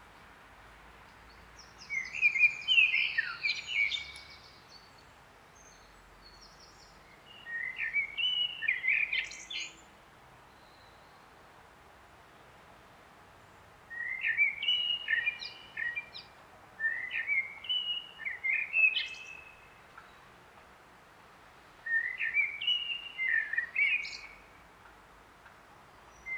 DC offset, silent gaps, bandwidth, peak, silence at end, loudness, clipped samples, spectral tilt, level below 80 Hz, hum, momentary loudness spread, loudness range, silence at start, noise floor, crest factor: under 0.1%; none; over 20 kHz; -14 dBFS; 0 s; -30 LUFS; under 0.1%; 0 dB/octave; -68 dBFS; none; 22 LU; 11 LU; 0 s; -57 dBFS; 22 dB